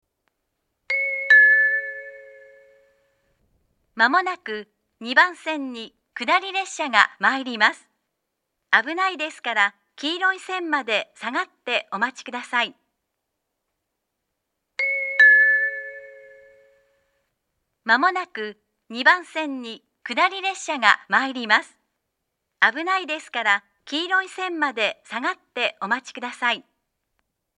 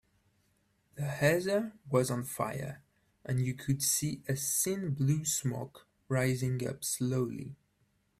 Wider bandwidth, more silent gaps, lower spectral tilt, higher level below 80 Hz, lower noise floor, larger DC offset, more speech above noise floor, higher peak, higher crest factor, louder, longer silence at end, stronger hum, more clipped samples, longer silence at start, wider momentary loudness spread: second, 11 kHz vs 16 kHz; neither; second, -1.5 dB/octave vs -4.5 dB/octave; second, -80 dBFS vs -66 dBFS; first, -79 dBFS vs -74 dBFS; neither; first, 56 dB vs 42 dB; first, 0 dBFS vs -14 dBFS; about the same, 24 dB vs 20 dB; first, -20 LUFS vs -32 LUFS; first, 0.95 s vs 0.65 s; neither; neither; about the same, 0.9 s vs 0.95 s; first, 16 LU vs 13 LU